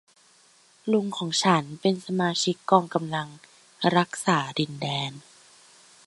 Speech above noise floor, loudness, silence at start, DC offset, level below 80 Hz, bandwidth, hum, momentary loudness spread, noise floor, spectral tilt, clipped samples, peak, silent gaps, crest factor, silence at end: 34 dB; -25 LUFS; 0.85 s; under 0.1%; -70 dBFS; 11.5 kHz; none; 9 LU; -59 dBFS; -4.5 dB/octave; under 0.1%; -4 dBFS; none; 24 dB; 0.85 s